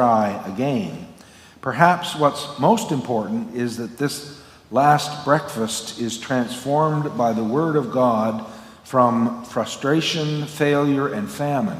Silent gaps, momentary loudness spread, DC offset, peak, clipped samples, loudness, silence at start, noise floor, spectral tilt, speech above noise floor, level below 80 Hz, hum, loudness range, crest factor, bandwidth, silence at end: none; 10 LU; under 0.1%; 0 dBFS; under 0.1%; -21 LUFS; 0 s; -46 dBFS; -5.5 dB/octave; 26 dB; -60 dBFS; none; 1 LU; 20 dB; 16 kHz; 0 s